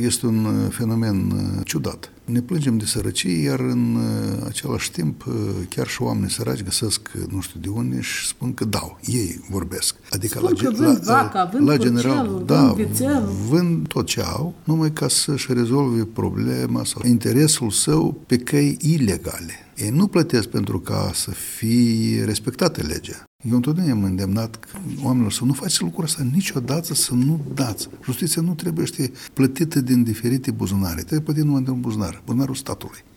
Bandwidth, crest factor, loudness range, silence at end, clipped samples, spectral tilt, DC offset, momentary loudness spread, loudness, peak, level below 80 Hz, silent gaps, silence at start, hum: 18 kHz; 18 dB; 5 LU; 0.15 s; under 0.1%; -5 dB/octave; under 0.1%; 9 LU; -21 LUFS; -4 dBFS; -46 dBFS; 23.27-23.39 s; 0 s; none